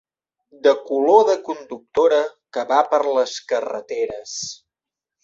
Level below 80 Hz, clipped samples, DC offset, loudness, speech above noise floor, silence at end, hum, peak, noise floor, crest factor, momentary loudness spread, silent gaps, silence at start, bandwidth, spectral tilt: -66 dBFS; under 0.1%; under 0.1%; -20 LUFS; 69 dB; 0.7 s; none; -2 dBFS; -88 dBFS; 18 dB; 14 LU; none; 0.65 s; 7.8 kHz; -2.5 dB/octave